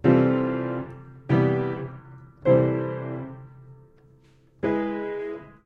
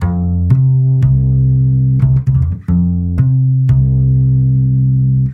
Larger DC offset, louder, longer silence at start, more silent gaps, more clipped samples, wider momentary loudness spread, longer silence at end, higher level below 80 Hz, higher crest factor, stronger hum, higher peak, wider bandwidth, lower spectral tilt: neither; second, -25 LUFS vs -12 LUFS; about the same, 0.05 s vs 0 s; neither; neither; first, 19 LU vs 3 LU; first, 0.15 s vs 0 s; second, -56 dBFS vs -24 dBFS; first, 20 dB vs 10 dB; neither; second, -6 dBFS vs 0 dBFS; first, 4.9 kHz vs 2 kHz; second, -10.5 dB/octave vs -12 dB/octave